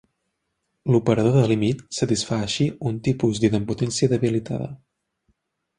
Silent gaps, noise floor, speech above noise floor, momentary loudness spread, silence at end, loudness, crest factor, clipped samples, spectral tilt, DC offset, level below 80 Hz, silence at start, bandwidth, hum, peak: none; -76 dBFS; 55 dB; 8 LU; 1.05 s; -22 LUFS; 18 dB; under 0.1%; -6 dB/octave; under 0.1%; -50 dBFS; 0.85 s; 11 kHz; none; -4 dBFS